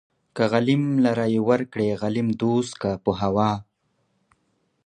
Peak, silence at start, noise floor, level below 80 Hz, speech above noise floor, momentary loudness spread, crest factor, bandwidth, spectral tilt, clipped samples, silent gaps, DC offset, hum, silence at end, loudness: -4 dBFS; 0.35 s; -70 dBFS; -54 dBFS; 48 dB; 5 LU; 18 dB; 9.8 kHz; -7 dB/octave; under 0.1%; none; under 0.1%; none; 1.25 s; -23 LUFS